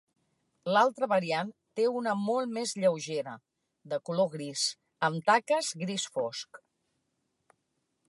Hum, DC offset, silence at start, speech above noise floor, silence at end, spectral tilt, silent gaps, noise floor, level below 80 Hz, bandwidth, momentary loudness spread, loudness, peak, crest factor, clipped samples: none; under 0.1%; 0.65 s; 50 dB; 1.5 s; -3.5 dB/octave; none; -80 dBFS; -84 dBFS; 11.5 kHz; 12 LU; -30 LUFS; -10 dBFS; 20 dB; under 0.1%